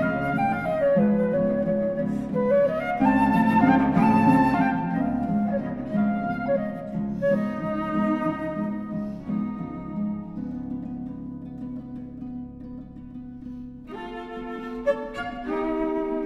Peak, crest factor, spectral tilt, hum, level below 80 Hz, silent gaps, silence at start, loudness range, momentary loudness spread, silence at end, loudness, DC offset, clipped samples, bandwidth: -6 dBFS; 18 dB; -9 dB/octave; none; -50 dBFS; none; 0 s; 15 LU; 17 LU; 0 s; -24 LUFS; under 0.1%; under 0.1%; 11.5 kHz